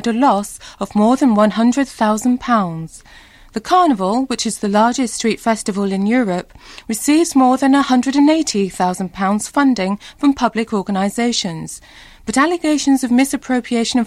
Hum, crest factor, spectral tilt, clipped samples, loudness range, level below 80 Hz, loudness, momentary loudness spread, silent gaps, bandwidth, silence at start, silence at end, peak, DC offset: none; 14 dB; -4.5 dB/octave; under 0.1%; 3 LU; -48 dBFS; -16 LUFS; 11 LU; none; 15 kHz; 0 s; 0 s; -2 dBFS; under 0.1%